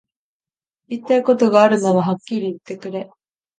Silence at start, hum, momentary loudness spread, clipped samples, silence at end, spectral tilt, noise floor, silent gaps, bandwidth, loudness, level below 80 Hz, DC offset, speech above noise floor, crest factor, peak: 0.9 s; none; 17 LU; under 0.1%; 0.55 s; -6.5 dB/octave; under -90 dBFS; none; 9.4 kHz; -17 LUFS; -70 dBFS; under 0.1%; over 73 dB; 18 dB; 0 dBFS